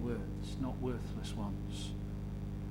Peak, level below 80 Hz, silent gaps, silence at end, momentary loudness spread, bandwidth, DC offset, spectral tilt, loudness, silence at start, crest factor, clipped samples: -24 dBFS; -46 dBFS; none; 0 s; 4 LU; 16 kHz; under 0.1%; -6.5 dB/octave; -41 LUFS; 0 s; 14 dB; under 0.1%